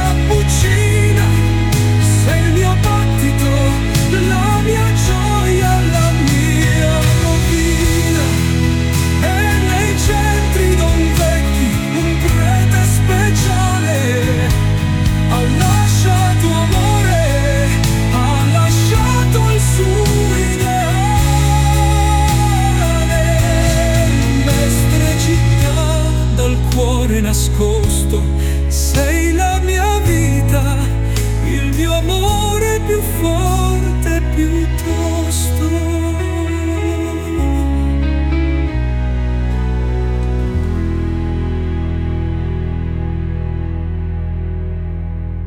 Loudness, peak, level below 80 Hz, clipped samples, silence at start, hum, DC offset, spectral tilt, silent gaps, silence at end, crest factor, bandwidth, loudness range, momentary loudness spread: -15 LUFS; -2 dBFS; -18 dBFS; under 0.1%; 0 s; none; under 0.1%; -5.5 dB/octave; none; 0 s; 12 dB; 18 kHz; 5 LU; 6 LU